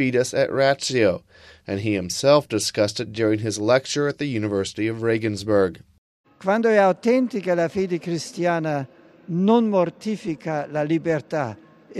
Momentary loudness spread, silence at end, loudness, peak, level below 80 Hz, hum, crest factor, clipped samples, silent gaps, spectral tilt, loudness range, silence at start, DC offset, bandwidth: 10 LU; 0 s; -22 LUFS; -4 dBFS; -60 dBFS; none; 18 dB; under 0.1%; 5.98-6.24 s; -5 dB/octave; 2 LU; 0 s; under 0.1%; 14 kHz